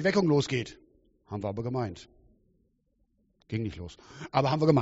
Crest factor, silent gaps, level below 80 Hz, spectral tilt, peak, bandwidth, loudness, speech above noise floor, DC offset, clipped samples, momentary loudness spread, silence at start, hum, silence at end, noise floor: 20 dB; none; -58 dBFS; -6 dB/octave; -10 dBFS; 8 kHz; -30 LUFS; 44 dB; under 0.1%; under 0.1%; 19 LU; 0 s; none; 0 s; -72 dBFS